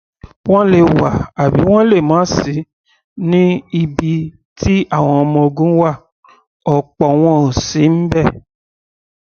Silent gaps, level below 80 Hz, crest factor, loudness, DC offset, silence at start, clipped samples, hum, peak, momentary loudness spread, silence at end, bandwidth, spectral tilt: 0.36-0.44 s, 2.73-2.84 s, 3.04-3.16 s, 4.45-4.56 s, 6.12-6.23 s, 6.47-6.60 s; -36 dBFS; 14 dB; -13 LUFS; under 0.1%; 0.25 s; under 0.1%; none; 0 dBFS; 10 LU; 0.85 s; 6.8 kHz; -7 dB/octave